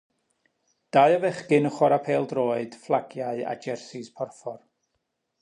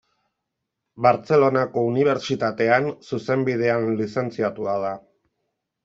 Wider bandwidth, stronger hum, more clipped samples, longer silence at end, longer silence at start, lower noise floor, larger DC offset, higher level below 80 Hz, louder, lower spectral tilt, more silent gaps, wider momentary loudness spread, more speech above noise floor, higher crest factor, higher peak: first, 10.5 kHz vs 7.8 kHz; neither; neither; about the same, 0.85 s vs 0.85 s; about the same, 0.95 s vs 0.95 s; about the same, -78 dBFS vs -81 dBFS; neither; second, -78 dBFS vs -66 dBFS; second, -25 LUFS vs -22 LUFS; about the same, -6.5 dB/octave vs -7 dB/octave; neither; first, 16 LU vs 8 LU; second, 54 dB vs 60 dB; about the same, 20 dB vs 20 dB; about the same, -6 dBFS vs -4 dBFS